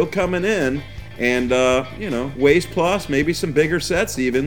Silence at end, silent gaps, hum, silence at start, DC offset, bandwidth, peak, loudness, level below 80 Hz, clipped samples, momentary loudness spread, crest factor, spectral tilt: 0 s; none; none; 0 s; 0.9%; over 20 kHz; -2 dBFS; -19 LUFS; -40 dBFS; under 0.1%; 8 LU; 18 dB; -5 dB/octave